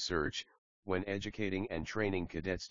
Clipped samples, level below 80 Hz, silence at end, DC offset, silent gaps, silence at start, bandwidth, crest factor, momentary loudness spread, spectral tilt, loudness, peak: under 0.1%; -56 dBFS; 0 s; 0.2%; 0.58-0.83 s; 0 s; 7.4 kHz; 18 dB; 7 LU; -4 dB/octave; -38 LUFS; -20 dBFS